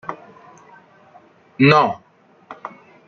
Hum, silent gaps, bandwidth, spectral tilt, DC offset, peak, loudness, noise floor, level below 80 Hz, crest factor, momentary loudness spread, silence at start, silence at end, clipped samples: none; none; 6.8 kHz; -7 dB/octave; under 0.1%; -2 dBFS; -15 LUFS; -50 dBFS; -60 dBFS; 20 dB; 24 LU; 0.1 s; 0.4 s; under 0.1%